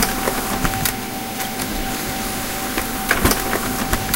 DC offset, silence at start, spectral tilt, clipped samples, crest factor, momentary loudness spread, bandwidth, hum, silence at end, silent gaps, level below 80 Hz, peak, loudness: under 0.1%; 0 s; -3 dB/octave; under 0.1%; 22 dB; 6 LU; 17.5 kHz; none; 0 s; none; -32 dBFS; 0 dBFS; -21 LUFS